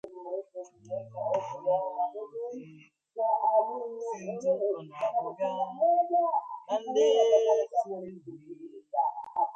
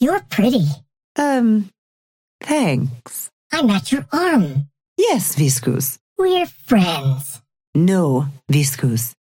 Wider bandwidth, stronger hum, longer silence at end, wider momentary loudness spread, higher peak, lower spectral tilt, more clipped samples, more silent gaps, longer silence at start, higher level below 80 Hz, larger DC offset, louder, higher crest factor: second, 8 kHz vs 17 kHz; neither; second, 0 s vs 0.2 s; first, 19 LU vs 12 LU; second, -12 dBFS vs -2 dBFS; about the same, -5 dB/octave vs -5.5 dB/octave; neither; second, none vs 1.04-1.15 s, 1.78-2.39 s, 3.33-3.50 s, 4.88-4.96 s, 6.01-6.16 s, 7.67-7.73 s; about the same, 0.05 s vs 0 s; second, -84 dBFS vs -56 dBFS; neither; second, -29 LUFS vs -18 LUFS; about the same, 18 dB vs 16 dB